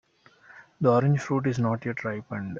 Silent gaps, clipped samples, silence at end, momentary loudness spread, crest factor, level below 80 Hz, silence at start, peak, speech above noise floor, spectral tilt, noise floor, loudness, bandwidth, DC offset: none; under 0.1%; 0 s; 10 LU; 20 dB; -64 dBFS; 0.5 s; -8 dBFS; 31 dB; -8 dB/octave; -56 dBFS; -26 LUFS; 7.4 kHz; under 0.1%